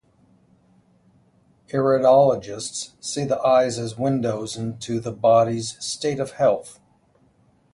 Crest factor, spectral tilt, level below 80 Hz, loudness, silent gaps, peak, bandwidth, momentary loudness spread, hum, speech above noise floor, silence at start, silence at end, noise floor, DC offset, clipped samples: 18 dB; -5 dB/octave; -60 dBFS; -21 LUFS; none; -4 dBFS; 11.5 kHz; 13 LU; none; 39 dB; 1.75 s; 1 s; -60 dBFS; under 0.1%; under 0.1%